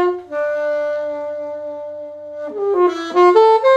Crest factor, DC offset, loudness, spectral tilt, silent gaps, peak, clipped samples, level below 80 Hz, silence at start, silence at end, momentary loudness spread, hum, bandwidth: 16 dB; under 0.1%; -17 LUFS; -4.5 dB/octave; none; 0 dBFS; under 0.1%; -66 dBFS; 0 s; 0 s; 18 LU; none; 8.2 kHz